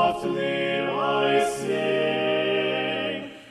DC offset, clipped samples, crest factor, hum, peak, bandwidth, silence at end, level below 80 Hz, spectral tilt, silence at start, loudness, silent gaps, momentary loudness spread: under 0.1%; under 0.1%; 16 dB; none; -10 dBFS; 13.5 kHz; 0 s; -64 dBFS; -4.5 dB/octave; 0 s; -24 LUFS; none; 5 LU